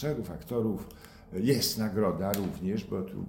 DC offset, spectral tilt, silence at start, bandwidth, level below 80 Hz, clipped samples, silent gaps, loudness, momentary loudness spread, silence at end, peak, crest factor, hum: under 0.1%; -5.5 dB/octave; 0 s; 17.5 kHz; -54 dBFS; under 0.1%; none; -31 LUFS; 12 LU; 0 s; -12 dBFS; 18 dB; none